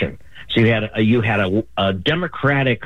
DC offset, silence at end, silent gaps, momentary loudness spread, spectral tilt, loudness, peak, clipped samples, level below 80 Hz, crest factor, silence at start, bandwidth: 1%; 0 s; none; 4 LU; -8 dB/octave; -18 LUFS; -4 dBFS; under 0.1%; -46 dBFS; 14 dB; 0 s; 7 kHz